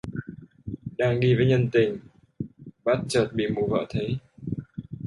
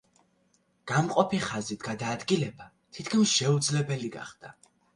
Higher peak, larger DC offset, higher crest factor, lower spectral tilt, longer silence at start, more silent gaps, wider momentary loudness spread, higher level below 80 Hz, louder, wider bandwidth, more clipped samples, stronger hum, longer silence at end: about the same, -8 dBFS vs -8 dBFS; neither; about the same, 18 dB vs 22 dB; first, -7 dB/octave vs -4.5 dB/octave; second, 0.05 s vs 0.85 s; neither; about the same, 18 LU vs 18 LU; first, -52 dBFS vs -66 dBFS; first, -25 LUFS vs -28 LUFS; about the same, 11.5 kHz vs 11.5 kHz; neither; neither; second, 0 s vs 0.45 s